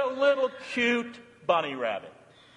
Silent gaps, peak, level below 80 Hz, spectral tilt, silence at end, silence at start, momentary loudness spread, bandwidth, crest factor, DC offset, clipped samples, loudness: none; -10 dBFS; -76 dBFS; -4 dB/octave; 0.45 s; 0 s; 13 LU; 10.5 kHz; 18 dB; under 0.1%; under 0.1%; -28 LUFS